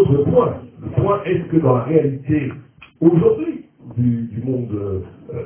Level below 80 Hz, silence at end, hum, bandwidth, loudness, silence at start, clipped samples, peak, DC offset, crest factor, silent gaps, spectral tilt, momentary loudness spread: -42 dBFS; 0 s; none; 3.4 kHz; -18 LUFS; 0 s; under 0.1%; 0 dBFS; under 0.1%; 18 dB; none; -13 dB/octave; 14 LU